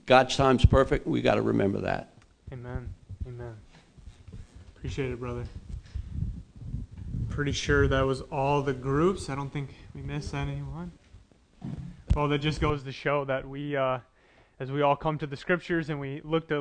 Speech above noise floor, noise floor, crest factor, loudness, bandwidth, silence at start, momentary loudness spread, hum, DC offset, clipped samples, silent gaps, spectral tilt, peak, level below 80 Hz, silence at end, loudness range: 33 dB; -60 dBFS; 24 dB; -28 LUFS; 10 kHz; 0.05 s; 18 LU; none; under 0.1%; under 0.1%; none; -6.5 dB/octave; -6 dBFS; -38 dBFS; 0 s; 11 LU